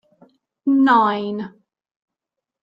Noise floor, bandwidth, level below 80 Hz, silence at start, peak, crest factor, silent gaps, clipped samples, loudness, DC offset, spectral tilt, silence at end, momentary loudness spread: -84 dBFS; 5.4 kHz; -70 dBFS; 0.65 s; -2 dBFS; 18 dB; none; under 0.1%; -18 LUFS; under 0.1%; -7 dB/octave; 1.15 s; 16 LU